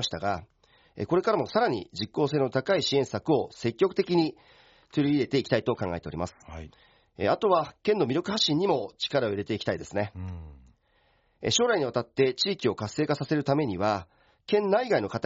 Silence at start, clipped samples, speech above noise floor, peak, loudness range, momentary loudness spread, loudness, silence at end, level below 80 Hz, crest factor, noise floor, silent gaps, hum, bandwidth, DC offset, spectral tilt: 0 s; under 0.1%; 40 dB; -10 dBFS; 3 LU; 10 LU; -27 LUFS; 0.05 s; -60 dBFS; 18 dB; -67 dBFS; none; none; 7.6 kHz; under 0.1%; -4 dB/octave